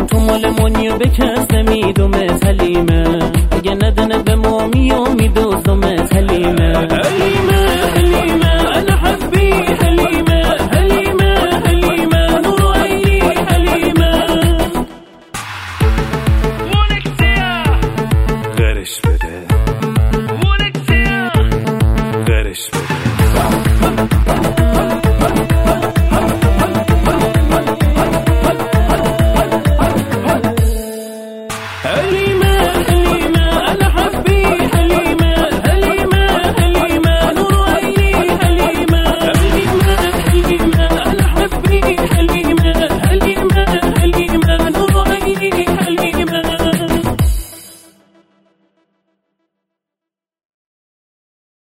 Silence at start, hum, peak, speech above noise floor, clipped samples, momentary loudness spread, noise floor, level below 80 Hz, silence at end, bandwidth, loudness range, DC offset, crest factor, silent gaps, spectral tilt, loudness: 0 s; none; 0 dBFS; 73 dB; under 0.1%; 4 LU; -84 dBFS; -18 dBFS; 3.85 s; 16.5 kHz; 3 LU; 1%; 12 dB; none; -6 dB/octave; -13 LUFS